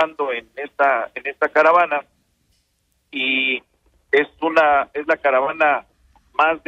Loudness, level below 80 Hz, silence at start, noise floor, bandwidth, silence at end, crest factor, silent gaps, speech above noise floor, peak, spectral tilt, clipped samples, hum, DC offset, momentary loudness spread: -19 LUFS; -60 dBFS; 0 s; -67 dBFS; 7.8 kHz; 0.1 s; 16 dB; none; 49 dB; -4 dBFS; -4 dB/octave; under 0.1%; none; under 0.1%; 11 LU